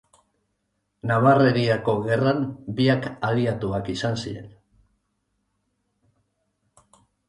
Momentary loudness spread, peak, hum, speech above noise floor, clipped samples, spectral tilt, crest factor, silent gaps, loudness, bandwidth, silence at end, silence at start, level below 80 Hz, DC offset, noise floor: 12 LU; -6 dBFS; none; 53 dB; under 0.1%; -7 dB/octave; 20 dB; none; -22 LUFS; 11 kHz; 2.8 s; 1.05 s; -56 dBFS; under 0.1%; -75 dBFS